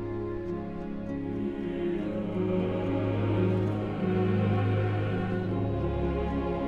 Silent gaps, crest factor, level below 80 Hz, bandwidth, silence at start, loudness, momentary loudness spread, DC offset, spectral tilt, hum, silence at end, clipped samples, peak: none; 14 dB; -42 dBFS; 5 kHz; 0 s; -30 LUFS; 8 LU; under 0.1%; -9.5 dB/octave; none; 0 s; under 0.1%; -14 dBFS